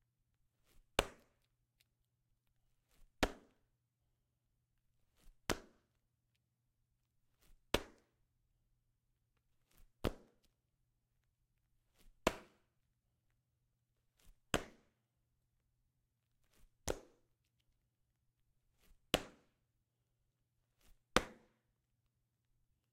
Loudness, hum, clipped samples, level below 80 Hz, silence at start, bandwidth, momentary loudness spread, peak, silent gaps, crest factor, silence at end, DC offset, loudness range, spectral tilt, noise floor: -42 LUFS; none; under 0.1%; -60 dBFS; 1 s; 16 kHz; 17 LU; -8 dBFS; none; 42 dB; 1.6 s; under 0.1%; 8 LU; -3.5 dB/octave; -85 dBFS